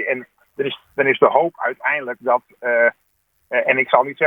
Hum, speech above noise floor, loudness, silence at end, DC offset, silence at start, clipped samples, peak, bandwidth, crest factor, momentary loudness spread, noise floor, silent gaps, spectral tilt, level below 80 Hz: none; 48 dB; -19 LUFS; 0 s; under 0.1%; 0 s; under 0.1%; 0 dBFS; 3.9 kHz; 20 dB; 10 LU; -66 dBFS; none; -7 dB/octave; -70 dBFS